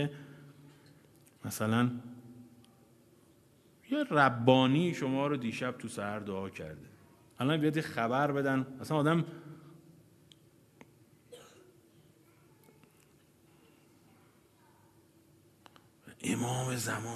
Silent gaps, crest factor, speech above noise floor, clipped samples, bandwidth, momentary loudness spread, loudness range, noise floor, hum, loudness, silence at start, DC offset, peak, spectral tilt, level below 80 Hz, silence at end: none; 26 dB; 33 dB; under 0.1%; 13.5 kHz; 26 LU; 9 LU; -64 dBFS; none; -32 LUFS; 0 s; under 0.1%; -8 dBFS; -5.5 dB/octave; -72 dBFS; 0 s